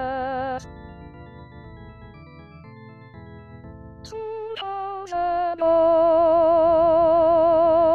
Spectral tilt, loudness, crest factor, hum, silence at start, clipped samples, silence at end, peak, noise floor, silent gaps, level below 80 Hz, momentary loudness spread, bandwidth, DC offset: -7 dB/octave; -20 LUFS; 12 dB; none; 0 s; under 0.1%; 0 s; -10 dBFS; -44 dBFS; none; -48 dBFS; 24 LU; 6.8 kHz; 0.1%